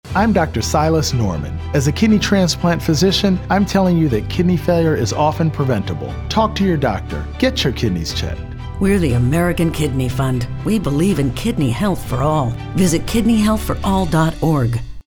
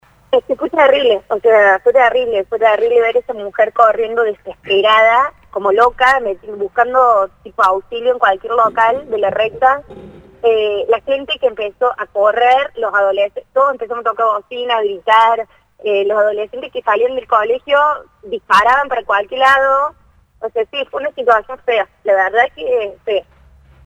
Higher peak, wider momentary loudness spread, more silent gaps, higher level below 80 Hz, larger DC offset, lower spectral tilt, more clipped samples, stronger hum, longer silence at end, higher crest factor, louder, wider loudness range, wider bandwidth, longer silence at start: second, -4 dBFS vs 0 dBFS; second, 6 LU vs 10 LU; neither; first, -30 dBFS vs -50 dBFS; neither; first, -6 dB/octave vs -3.5 dB/octave; neither; neither; second, 0.05 s vs 0.65 s; about the same, 12 dB vs 14 dB; second, -17 LUFS vs -14 LUFS; about the same, 3 LU vs 3 LU; first, 19.5 kHz vs 10.5 kHz; second, 0.05 s vs 0.3 s